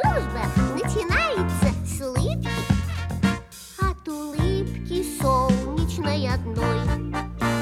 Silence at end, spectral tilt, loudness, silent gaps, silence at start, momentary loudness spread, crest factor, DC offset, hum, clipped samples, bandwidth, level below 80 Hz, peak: 0 s; -6 dB/octave; -24 LUFS; none; 0 s; 6 LU; 18 dB; under 0.1%; none; under 0.1%; 16.5 kHz; -32 dBFS; -6 dBFS